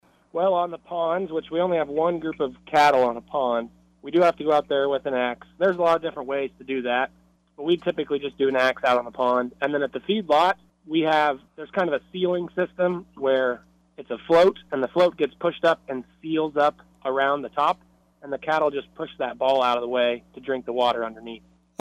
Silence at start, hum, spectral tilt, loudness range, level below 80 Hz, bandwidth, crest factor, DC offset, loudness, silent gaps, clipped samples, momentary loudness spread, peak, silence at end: 0.35 s; none; -5.5 dB/octave; 3 LU; -62 dBFS; 12 kHz; 16 dB; under 0.1%; -24 LUFS; none; under 0.1%; 12 LU; -8 dBFS; 0.4 s